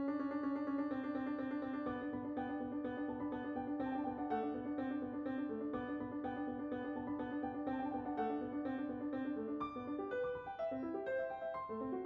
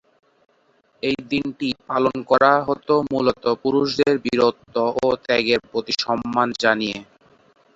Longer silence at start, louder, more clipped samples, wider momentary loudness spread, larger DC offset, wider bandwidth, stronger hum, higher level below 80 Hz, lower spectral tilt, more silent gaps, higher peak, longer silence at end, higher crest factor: second, 0 s vs 1.05 s; second, -42 LUFS vs -20 LUFS; neither; second, 3 LU vs 8 LU; neither; second, 4.9 kHz vs 8 kHz; neither; second, -70 dBFS vs -56 dBFS; about the same, -5.5 dB/octave vs -5 dB/octave; neither; second, -28 dBFS vs -2 dBFS; second, 0 s vs 0.75 s; second, 14 dB vs 20 dB